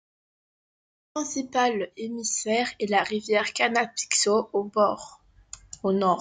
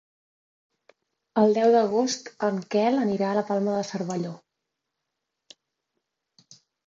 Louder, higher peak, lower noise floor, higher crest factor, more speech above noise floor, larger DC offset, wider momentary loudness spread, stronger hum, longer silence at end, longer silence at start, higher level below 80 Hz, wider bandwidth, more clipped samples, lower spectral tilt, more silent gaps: about the same, -25 LUFS vs -24 LUFS; about the same, -8 dBFS vs -8 dBFS; second, -48 dBFS vs -83 dBFS; about the same, 20 dB vs 18 dB; second, 23 dB vs 59 dB; neither; about the same, 13 LU vs 11 LU; neither; second, 0 s vs 2.5 s; second, 1.15 s vs 1.35 s; first, -66 dBFS vs -74 dBFS; first, 9.6 kHz vs 7.8 kHz; neither; second, -2.5 dB/octave vs -5.5 dB/octave; neither